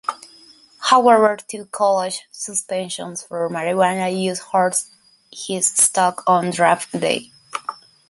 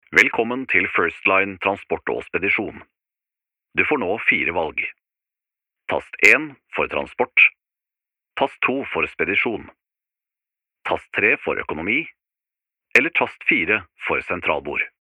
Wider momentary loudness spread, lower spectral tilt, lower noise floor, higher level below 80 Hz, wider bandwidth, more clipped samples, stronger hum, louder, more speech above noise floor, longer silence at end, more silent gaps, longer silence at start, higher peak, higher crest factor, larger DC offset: first, 15 LU vs 12 LU; about the same, -3 dB/octave vs -4 dB/octave; second, -48 dBFS vs -87 dBFS; second, -66 dBFS vs -58 dBFS; second, 12 kHz vs 16.5 kHz; neither; neither; about the same, -18 LUFS vs -19 LUFS; second, 30 dB vs 66 dB; first, 0.35 s vs 0.15 s; neither; about the same, 0.1 s vs 0.1 s; about the same, 0 dBFS vs 0 dBFS; about the same, 20 dB vs 22 dB; neither